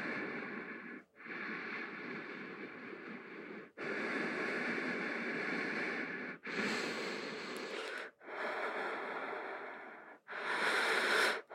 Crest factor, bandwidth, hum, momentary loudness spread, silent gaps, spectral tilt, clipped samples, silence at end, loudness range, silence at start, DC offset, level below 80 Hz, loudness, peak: 20 dB; 16 kHz; none; 16 LU; none; -3 dB/octave; under 0.1%; 0 s; 6 LU; 0 s; under 0.1%; under -90 dBFS; -39 LUFS; -20 dBFS